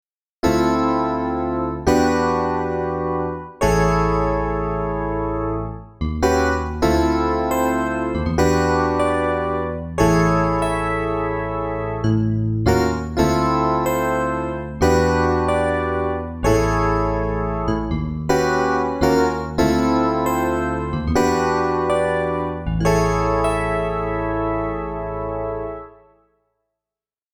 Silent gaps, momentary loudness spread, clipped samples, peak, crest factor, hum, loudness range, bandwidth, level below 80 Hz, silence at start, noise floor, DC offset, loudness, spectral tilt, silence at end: none; 7 LU; under 0.1%; -2 dBFS; 18 dB; none; 2 LU; 20 kHz; -32 dBFS; 0.45 s; under -90 dBFS; under 0.1%; -20 LUFS; -6.5 dB/octave; 1.45 s